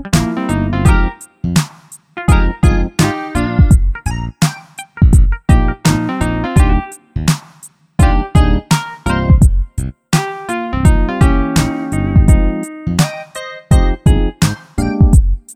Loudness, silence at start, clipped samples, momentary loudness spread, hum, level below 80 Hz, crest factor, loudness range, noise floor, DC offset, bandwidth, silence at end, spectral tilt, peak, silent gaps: -14 LUFS; 0 s; under 0.1%; 10 LU; none; -16 dBFS; 12 dB; 1 LU; -41 dBFS; under 0.1%; 16 kHz; 0 s; -6 dB/octave; 0 dBFS; none